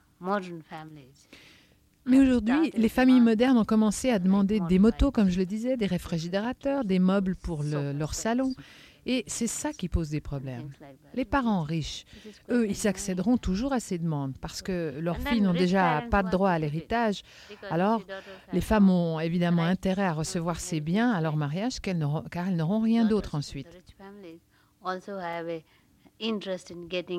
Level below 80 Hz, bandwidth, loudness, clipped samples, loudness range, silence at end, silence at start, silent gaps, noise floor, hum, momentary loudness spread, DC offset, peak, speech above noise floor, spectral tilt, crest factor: -44 dBFS; 15 kHz; -27 LUFS; under 0.1%; 8 LU; 0 s; 0.2 s; none; -61 dBFS; none; 16 LU; under 0.1%; -10 dBFS; 34 dB; -6 dB/octave; 18 dB